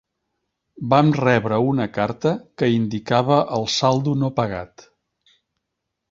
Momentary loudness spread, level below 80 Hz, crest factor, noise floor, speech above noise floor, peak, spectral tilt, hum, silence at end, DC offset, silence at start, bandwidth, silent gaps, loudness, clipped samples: 8 LU; -54 dBFS; 20 dB; -80 dBFS; 60 dB; -2 dBFS; -6 dB/octave; none; 1.45 s; under 0.1%; 0.75 s; 7.6 kHz; none; -20 LUFS; under 0.1%